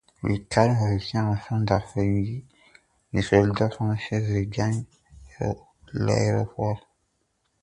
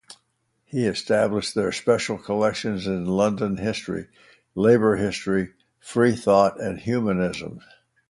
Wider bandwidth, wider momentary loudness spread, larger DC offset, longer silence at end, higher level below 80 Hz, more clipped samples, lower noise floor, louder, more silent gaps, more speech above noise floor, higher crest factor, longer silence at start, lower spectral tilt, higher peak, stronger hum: second, 10 kHz vs 11.5 kHz; about the same, 11 LU vs 12 LU; neither; first, 0.85 s vs 0.5 s; first, -46 dBFS vs -52 dBFS; neither; about the same, -72 dBFS vs -71 dBFS; about the same, -25 LUFS vs -23 LUFS; neither; about the same, 49 dB vs 49 dB; about the same, 22 dB vs 20 dB; first, 0.25 s vs 0.1 s; about the same, -7 dB/octave vs -6 dB/octave; about the same, -4 dBFS vs -4 dBFS; neither